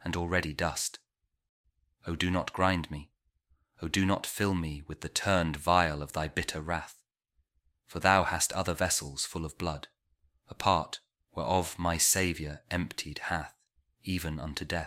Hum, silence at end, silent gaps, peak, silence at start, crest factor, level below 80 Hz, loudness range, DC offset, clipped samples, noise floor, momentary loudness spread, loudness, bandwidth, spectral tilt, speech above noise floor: none; 0 s; 1.49-1.64 s; -8 dBFS; 0 s; 24 dB; -50 dBFS; 3 LU; under 0.1%; under 0.1%; -77 dBFS; 15 LU; -30 LUFS; 16 kHz; -3.5 dB/octave; 46 dB